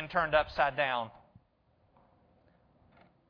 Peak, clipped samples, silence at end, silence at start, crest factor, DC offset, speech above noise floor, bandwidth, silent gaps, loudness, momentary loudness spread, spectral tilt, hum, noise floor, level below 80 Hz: -12 dBFS; under 0.1%; 2.2 s; 0 s; 24 dB; under 0.1%; 40 dB; 5.4 kHz; none; -30 LUFS; 8 LU; -6 dB/octave; none; -70 dBFS; -58 dBFS